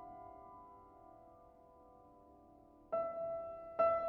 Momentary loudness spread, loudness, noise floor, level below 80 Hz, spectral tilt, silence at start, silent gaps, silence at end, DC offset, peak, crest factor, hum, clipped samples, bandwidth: 24 LU; -41 LUFS; -63 dBFS; -72 dBFS; -5.5 dB/octave; 0 s; none; 0 s; under 0.1%; -22 dBFS; 22 dB; none; under 0.1%; 4.3 kHz